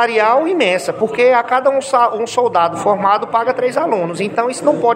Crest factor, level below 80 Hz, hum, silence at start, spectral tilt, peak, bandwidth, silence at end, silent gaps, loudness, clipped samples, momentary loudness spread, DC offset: 14 dB; -64 dBFS; none; 0 s; -4.5 dB/octave; 0 dBFS; 14.5 kHz; 0 s; none; -15 LUFS; under 0.1%; 5 LU; under 0.1%